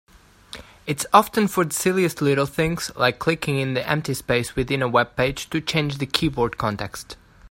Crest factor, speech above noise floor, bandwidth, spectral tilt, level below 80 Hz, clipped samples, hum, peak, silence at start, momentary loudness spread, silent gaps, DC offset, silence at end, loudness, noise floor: 22 dB; 22 dB; 16.5 kHz; -4.5 dB/octave; -46 dBFS; under 0.1%; none; 0 dBFS; 0.55 s; 14 LU; none; under 0.1%; 0.05 s; -22 LUFS; -44 dBFS